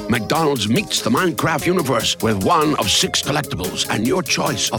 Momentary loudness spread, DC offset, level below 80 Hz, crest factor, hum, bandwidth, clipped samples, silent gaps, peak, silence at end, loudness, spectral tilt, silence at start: 4 LU; under 0.1%; -46 dBFS; 14 dB; none; 19 kHz; under 0.1%; none; -6 dBFS; 0 s; -18 LUFS; -3.5 dB/octave; 0 s